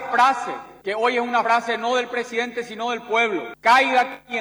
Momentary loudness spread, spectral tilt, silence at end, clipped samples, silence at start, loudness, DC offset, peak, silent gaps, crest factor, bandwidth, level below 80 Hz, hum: 11 LU; -2.5 dB/octave; 0 s; under 0.1%; 0 s; -21 LUFS; under 0.1%; -4 dBFS; none; 16 dB; over 20 kHz; -66 dBFS; 50 Hz at -65 dBFS